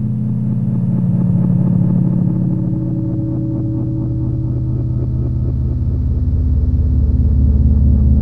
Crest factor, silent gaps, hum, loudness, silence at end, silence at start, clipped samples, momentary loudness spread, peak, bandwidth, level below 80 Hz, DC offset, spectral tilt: 12 dB; none; none; -16 LUFS; 0 s; 0 s; under 0.1%; 6 LU; -2 dBFS; 1.8 kHz; -18 dBFS; 2%; -13 dB/octave